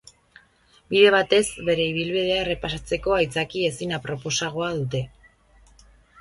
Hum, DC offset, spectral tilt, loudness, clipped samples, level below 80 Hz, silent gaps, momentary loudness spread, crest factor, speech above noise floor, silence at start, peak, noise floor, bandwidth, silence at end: none; under 0.1%; -4 dB/octave; -23 LUFS; under 0.1%; -48 dBFS; none; 12 LU; 22 dB; 36 dB; 0.9 s; -2 dBFS; -58 dBFS; 11.5 kHz; 1.1 s